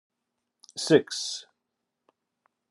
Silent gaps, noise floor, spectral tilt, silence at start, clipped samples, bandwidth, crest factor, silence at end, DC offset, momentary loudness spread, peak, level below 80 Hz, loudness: none; -83 dBFS; -4 dB/octave; 0.75 s; under 0.1%; 12.5 kHz; 26 dB; 1.3 s; under 0.1%; 16 LU; -6 dBFS; -82 dBFS; -26 LUFS